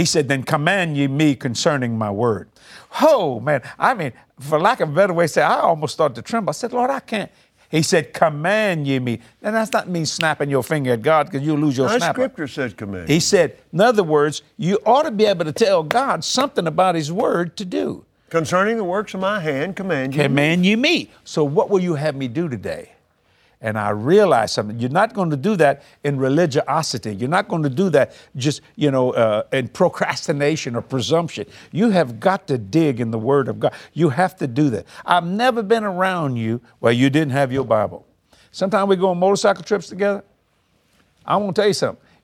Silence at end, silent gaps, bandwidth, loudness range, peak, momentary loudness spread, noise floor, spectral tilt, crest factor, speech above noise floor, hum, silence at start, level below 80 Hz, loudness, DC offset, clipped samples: 0.3 s; none; 16.5 kHz; 2 LU; 0 dBFS; 8 LU; -63 dBFS; -5 dB/octave; 18 dB; 44 dB; none; 0 s; -60 dBFS; -19 LUFS; under 0.1%; under 0.1%